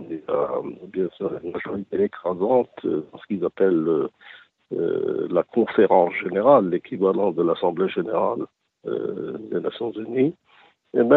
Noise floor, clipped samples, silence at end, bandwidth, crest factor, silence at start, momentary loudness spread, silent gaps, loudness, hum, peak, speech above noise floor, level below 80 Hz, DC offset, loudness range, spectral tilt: -55 dBFS; under 0.1%; 0 s; 4.2 kHz; 20 dB; 0 s; 13 LU; none; -23 LUFS; none; -2 dBFS; 33 dB; -66 dBFS; under 0.1%; 5 LU; -9.5 dB/octave